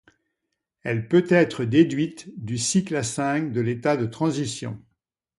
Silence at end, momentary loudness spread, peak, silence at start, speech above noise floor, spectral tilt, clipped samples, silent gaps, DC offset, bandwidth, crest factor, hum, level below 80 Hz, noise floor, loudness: 0.6 s; 13 LU; -6 dBFS; 0.85 s; 58 dB; -5.5 dB/octave; under 0.1%; none; under 0.1%; 11.5 kHz; 18 dB; none; -60 dBFS; -81 dBFS; -23 LUFS